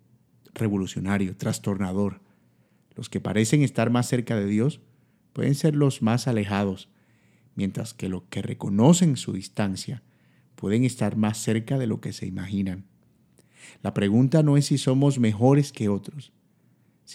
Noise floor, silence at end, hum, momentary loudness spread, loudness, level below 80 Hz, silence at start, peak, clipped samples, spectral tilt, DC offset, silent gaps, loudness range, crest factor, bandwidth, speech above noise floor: -62 dBFS; 0 s; none; 13 LU; -24 LUFS; -68 dBFS; 0.55 s; -4 dBFS; under 0.1%; -6.5 dB/octave; under 0.1%; none; 5 LU; 20 dB; 14.5 kHz; 39 dB